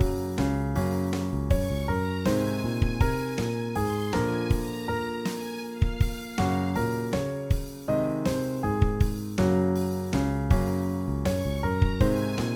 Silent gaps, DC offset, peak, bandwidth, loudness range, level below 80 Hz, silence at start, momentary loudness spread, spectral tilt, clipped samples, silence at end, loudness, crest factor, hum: none; under 0.1%; -8 dBFS; 20 kHz; 2 LU; -34 dBFS; 0 s; 5 LU; -7 dB/octave; under 0.1%; 0 s; -27 LUFS; 18 dB; none